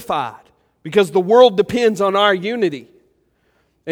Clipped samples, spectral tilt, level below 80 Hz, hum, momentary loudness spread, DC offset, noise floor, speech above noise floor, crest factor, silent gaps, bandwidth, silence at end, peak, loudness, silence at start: under 0.1%; -5 dB/octave; -58 dBFS; none; 20 LU; under 0.1%; -62 dBFS; 47 dB; 18 dB; none; 15 kHz; 0 s; 0 dBFS; -15 LUFS; 0 s